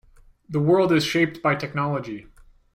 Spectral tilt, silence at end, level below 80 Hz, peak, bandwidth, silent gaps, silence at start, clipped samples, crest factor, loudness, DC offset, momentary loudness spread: -6 dB/octave; 0.55 s; -56 dBFS; -8 dBFS; 16 kHz; none; 0.5 s; under 0.1%; 16 dB; -22 LUFS; under 0.1%; 12 LU